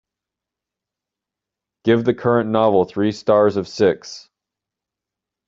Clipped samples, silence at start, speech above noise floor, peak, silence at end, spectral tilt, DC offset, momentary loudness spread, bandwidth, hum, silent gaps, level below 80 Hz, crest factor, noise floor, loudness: under 0.1%; 1.85 s; 69 dB; -2 dBFS; 1.3 s; -6.5 dB/octave; under 0.1%; 10 LU; 7.8 kHz; none; none; -60 dBFS; 18 dB; -86 dBFS; -18 LUFS